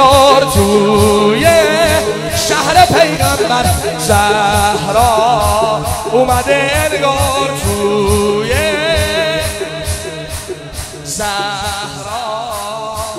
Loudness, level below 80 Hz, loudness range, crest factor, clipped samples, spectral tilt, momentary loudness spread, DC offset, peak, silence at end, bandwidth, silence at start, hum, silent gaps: -12 LUFS; -28 dBFS; 8 LU; 12 dB; under 0.1%; -4 dB/octave; 12 LU; under 0.1%; 0 dBFS; 0 s; 16.5 kHz; 0 s; none; none